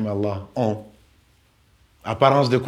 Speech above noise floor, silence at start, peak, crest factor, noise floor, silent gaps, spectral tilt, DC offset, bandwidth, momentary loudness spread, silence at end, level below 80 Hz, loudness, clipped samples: 38 dB; 0 s; -2 dBFS; 22 dB; -59 dBFS; none; -7 dB/octave; under 0.1%; 12.5 kHz; 16 LU; 0 s; -58 dBFS; -22 LUFS; under 0.1%